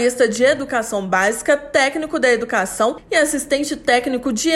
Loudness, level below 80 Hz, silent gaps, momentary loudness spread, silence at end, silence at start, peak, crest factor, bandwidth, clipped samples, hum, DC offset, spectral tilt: -18 LUFS; -50 dBFS; none; 5 LU; 0 s; 0 s; -4 dBFS; 14 dB; 15 kHz; under 0.1%; none; under 0.1%; -2.5 dB/octave